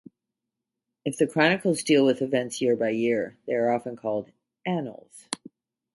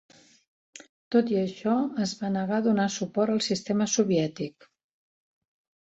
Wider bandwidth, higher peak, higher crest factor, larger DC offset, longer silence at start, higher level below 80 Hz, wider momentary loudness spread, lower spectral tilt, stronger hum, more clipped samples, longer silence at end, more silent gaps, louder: first, 11.5 kHz vs 8.2 kHz; first, -6 dBFS vs -10 dBFS; about the same, 22 dB vs 18 dB; neither; first, 1.05 s vs 0.75 s; about the same, -72 dBFS vs -68 dBFS; first, 15 LU vs 6 LU; about the same, -5 dB/octave vs -5 dB/octave; neither; neither; second, 0.6 s vs 1.45 s; second, none vs 0.89-1.11 s; about the same, -25 LUFS vs -27 LUFS